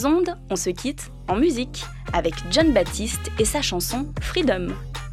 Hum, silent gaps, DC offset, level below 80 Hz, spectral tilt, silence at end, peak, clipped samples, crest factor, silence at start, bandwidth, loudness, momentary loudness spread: none; none; under 0.1%; -34 dBFS; -4 dB/octave; 0 s; -8 dBFS; under 0.1%; 16 dB; 0 s; 15 kHz; -23 LUFS; 11 LU